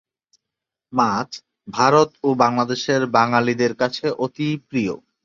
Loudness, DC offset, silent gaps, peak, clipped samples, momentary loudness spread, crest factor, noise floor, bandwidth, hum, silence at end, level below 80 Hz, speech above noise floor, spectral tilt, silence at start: -20 LUFS; under 0.1%; none; -2 dBFS; under 0.1%; 10 LU; 18 dB; -85 dBFS; 7.6 kHz; none; 0.3 s; -62 dBFS; 66 dB; -5.5 dB/octave; 0.9 s